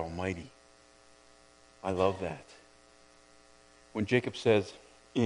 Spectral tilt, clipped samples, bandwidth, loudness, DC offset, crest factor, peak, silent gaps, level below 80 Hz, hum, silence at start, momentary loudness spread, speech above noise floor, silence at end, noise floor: -6 dB/octave; under 0.1%; 10.5 kHz; -32 LUFS; under 0.1%; 24 dB; -12 dBFS; none; -62 dBFS; none; 0 s; 17 LU; 29 dB; 0 s; -60 dBFS